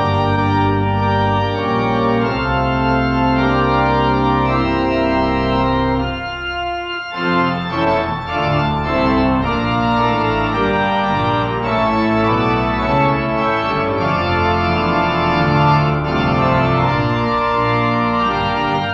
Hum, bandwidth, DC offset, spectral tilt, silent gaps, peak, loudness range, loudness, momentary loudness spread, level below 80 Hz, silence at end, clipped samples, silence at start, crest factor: none; 7.8 kHz; under 0.1%; -7.5 dB/octave; none; -2 dBFS; 3 LU; -16 LUFS; 3 LU; -32 dBFS; 0 s; under 0.1%; 0 s; 14 dB